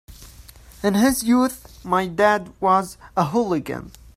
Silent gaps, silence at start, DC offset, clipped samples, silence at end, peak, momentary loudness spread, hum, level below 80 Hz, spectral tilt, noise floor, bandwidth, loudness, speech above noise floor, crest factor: none; 0.1 s; under 0.1%; under 0.1%; 0.3 s; -4 dBFS; 9 LU; none; -48 dBFS; -5 dB/octave; -45 dBFS; 16 kHz; -20 LUFS; 24 dB; 18 dB